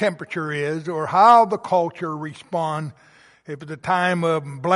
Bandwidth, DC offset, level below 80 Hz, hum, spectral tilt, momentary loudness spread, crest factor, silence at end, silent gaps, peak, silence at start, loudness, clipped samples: 11.5 kHz; under 0.1%; -66 dBFS; none; -6 dB/octave; 19 LU; 18 dB; 0 s; none; -2 dBFS; 0 s; -20 LUFS; under 0.1%